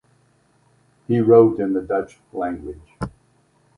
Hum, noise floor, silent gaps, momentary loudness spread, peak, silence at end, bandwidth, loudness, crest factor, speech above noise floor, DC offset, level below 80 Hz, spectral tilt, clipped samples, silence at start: none; -60 dBFS; none; 20 LU; 0 dBFS; 0.7 s; 10 kHz; -18 LUFS; 20 dB; 42 dB; under 0.1%; -50 dBFS; -9.5 dB/octave; under 0.1%; 1.1 s